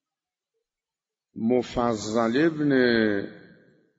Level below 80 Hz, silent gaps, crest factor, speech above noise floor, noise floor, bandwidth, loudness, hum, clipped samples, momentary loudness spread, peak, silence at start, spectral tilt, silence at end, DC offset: -56 dBFS; none; 18 dB; over 67 dB; under -90 dBFS; 8 kHz; -24 LUFS; none; under 0.1%; 9 LU; -8 dBFS; 1.35 s; -4.5 dB/octave; 0.6 s; under 0.1%